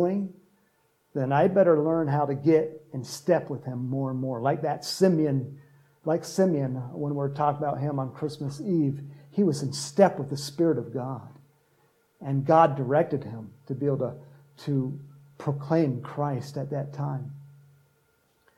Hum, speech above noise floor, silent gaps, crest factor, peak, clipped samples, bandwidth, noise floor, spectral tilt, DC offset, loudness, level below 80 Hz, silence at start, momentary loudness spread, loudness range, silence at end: none; 42 dB; none; 22 dB; -6 dBFS; under 0.1%; 14 kHz; -68 dBFS; -7 dB/octave; under 0.1%; -27 LUFS; -74 dBFS; 0 s; 14 LU; 5 LU; 1.05 s